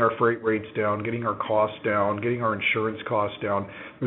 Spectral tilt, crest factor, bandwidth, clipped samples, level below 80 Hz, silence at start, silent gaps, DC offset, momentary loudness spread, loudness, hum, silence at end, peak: -4.5 dB/octave; 18 dB; 4 kHz; under 0.1%; -64 dBFS; 0 s; none; under 0.1%; 5 LU; -25 LUFS; none; 0 s; -8 dBFS